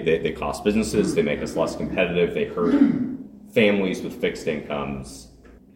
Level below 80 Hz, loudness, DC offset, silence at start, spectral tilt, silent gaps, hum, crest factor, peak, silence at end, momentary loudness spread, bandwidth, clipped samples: -46 dBFS; -23 LUFS; under 0.1%; 0 s; -5.5 dB/octave; none; none; 18 dB; -4 dBFS; 0.2 s; 11 LU; 16.5 kHz; under 0.1%